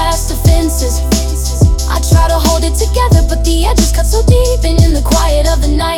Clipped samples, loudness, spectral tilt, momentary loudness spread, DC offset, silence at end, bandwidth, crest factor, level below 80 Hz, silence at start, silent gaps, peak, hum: 0.1%; -11 LUFS; -5 dB/octave; 3 LU; under 0.1%; 0 s; 17.5 kHz; 10 dB; -12 dBFS; 0 s; none; 0 dBFS; none